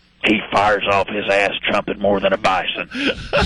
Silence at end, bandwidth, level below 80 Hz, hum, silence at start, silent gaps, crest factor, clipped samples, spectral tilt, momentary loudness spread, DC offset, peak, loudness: 0 s; 11.5 kHz; -42 dBFS; none; 0.25 s; none; 14 dB; under 0.1%; -4.5 dB/octave; 5 LU; under 0.1%; -4 dBFS; -18 LUFS